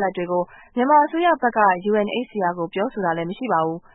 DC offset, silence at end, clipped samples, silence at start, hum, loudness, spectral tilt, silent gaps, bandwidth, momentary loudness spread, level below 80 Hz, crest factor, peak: under 0.1%; 0.15 s; under 0.1%; 0 s; none; -21 LUFS; -10.5 dB/octave; none; 4 kHz; 8 LU; -60 dBFS; 18 dB; -4 dBFS